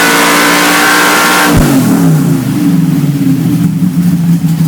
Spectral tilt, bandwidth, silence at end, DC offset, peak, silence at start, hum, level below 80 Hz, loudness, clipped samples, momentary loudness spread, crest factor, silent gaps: -4.5 dB/octave; 20 kHz; 0 s; under 0.1%; 0 dBFS; 0 s; none; -30 dBFS; -8 LUFS; 0.4%; 5 LU; 8 dB; none